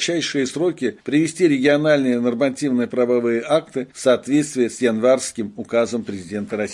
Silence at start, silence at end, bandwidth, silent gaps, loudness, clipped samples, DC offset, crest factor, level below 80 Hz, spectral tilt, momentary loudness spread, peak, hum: 0 s; 0 s; 11.5 kHz; none; -20 LUFS; under 0.1%; under 0.1%; 16 dB; -64 dBFS; -4.5 dB/octave; 10 LU; -4 dBFS; none